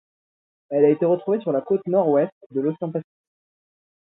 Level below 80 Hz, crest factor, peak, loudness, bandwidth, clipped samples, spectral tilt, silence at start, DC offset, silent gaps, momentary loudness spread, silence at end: -72 dBFS; 18 dB; -6 dBFS; -22 LUFS; 4 kHz; under 0.1%; -12.5 dB/octave; 0.7 s; under 0.1%; 2.32-2.50 s; 10 LU; 1.1 s